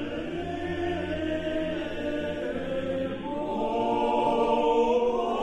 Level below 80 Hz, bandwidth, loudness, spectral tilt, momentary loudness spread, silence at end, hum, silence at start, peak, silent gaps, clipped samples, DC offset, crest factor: -48 dBFS; 9 kHz; -28 LUFS; -6.5 dB/octave; 9 LU; 0 s; none; 0 s; -12 dBFS; none; under 0.1%; under 0.1%; 16 dB